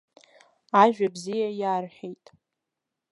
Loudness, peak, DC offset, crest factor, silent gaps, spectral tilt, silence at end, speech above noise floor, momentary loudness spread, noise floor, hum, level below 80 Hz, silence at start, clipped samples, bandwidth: -24 LUFS; -4 dBFS; under 0.1%; 24 dB; none; -5.5 dB/octave; 1 s; 61 dB; 20 LU; -85 dBFS; none; -82 dBFS; 0.75 s; under 0.1%; 11.5 kHz